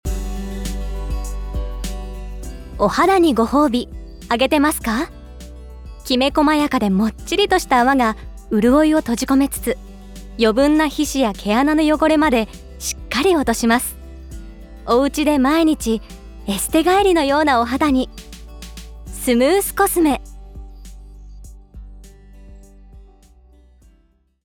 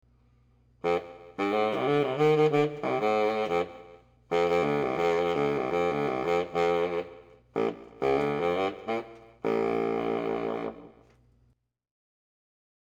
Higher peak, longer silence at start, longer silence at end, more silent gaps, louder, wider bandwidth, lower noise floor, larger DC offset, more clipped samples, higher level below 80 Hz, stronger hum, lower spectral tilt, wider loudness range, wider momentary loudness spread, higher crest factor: first, -4 dBFS vs -14 dBFS; second, 0.05 s vs 0.85 s; second, 1.4 s vs 1.95 s; neither; first, -17 LUFS vs -28 LUFS; first, over 20 kHz vs 9.4 kHz; second, -58 dBFS vs -68 dBFS; neither; neither; first, -32 dBFS vs -62 dBFS; neither; second, -4.5 dB/octave vs -6.5 dB/octave; about the same, 4 LU vs 6 LU; first, 22 LU vs 10 LU; about the same, 16 dB vs 14 dB